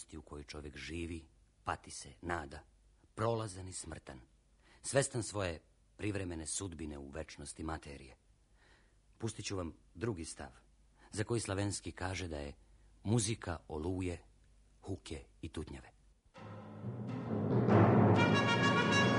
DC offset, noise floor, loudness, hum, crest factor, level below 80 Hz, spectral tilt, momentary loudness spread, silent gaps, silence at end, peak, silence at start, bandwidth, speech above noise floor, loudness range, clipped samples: under 0.1%; -67 dBFS; -37 LUFS; none; 24 dB; -58 dBFS; -5 dB/octave; 21 LU; none; 0 s; -12 dBFS; 0 s; 10.5 kHz; 26 dB; 12 LU; under 0.1%